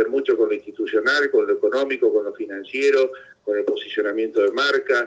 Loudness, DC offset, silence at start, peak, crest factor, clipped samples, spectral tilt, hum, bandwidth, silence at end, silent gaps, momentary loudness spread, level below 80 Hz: -21 LUFS; under 0.1%; 0 s; -8 dBFS; 14 dB; under 0.1%; -3 dB/octave; none; 7.8 kHz; 0 s; none; 8 LU; -72 dBFS